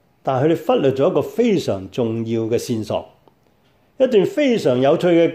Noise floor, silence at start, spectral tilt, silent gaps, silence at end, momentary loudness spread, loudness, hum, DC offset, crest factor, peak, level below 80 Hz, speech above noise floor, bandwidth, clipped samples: -58 dBFS; 0.25 s; -6.5 dB/octave; none; 0 s; 7 LU; -18 LUFS; none; under 0.1%; 14 dB; -4 dBFS; -60 dBFS; 41 dB; 16 kHz; under 0.1%